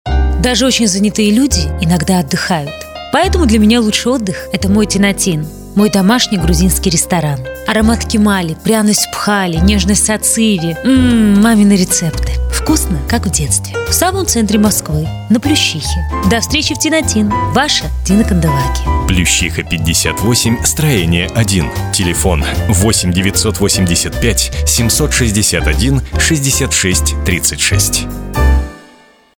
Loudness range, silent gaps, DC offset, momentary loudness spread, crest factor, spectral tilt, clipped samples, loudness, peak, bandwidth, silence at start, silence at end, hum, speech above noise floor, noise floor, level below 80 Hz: 2 LU; none; under 0.1%; 5 LU; 12 dB; -4 dB/octave; under 0.1%; -12 LUFS; 0 dBFS; 19.5 kHz; 0.05 s; 0.6 s; none; 32 dB; -44 dBFS; -20 dBFS